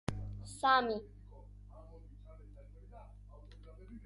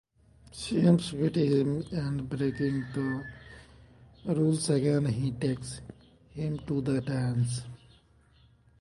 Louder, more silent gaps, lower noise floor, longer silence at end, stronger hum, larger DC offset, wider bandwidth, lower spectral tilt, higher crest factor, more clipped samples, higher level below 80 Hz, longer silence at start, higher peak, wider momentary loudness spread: second, -34 LUFS vs -29 LUFS; neither; second, -54 dBFS vs -61 dBFS; second, 0 s vs 1.05 s; first, 50 Hz at -55 dBFS vs none; neither; about the same, 11.5 kHz vs 11.5 kHz; second, -4.5 dB/octave vs -6.5 dB/octave; about the same, 24 dB vs 20 dB; neither; about the same, -54 dBFS vs -56 dBFS; second, 0.1 s vs 0.55 s; second, -16 dBFS vs -10 dBFS; first, 27 LU vs 18 LU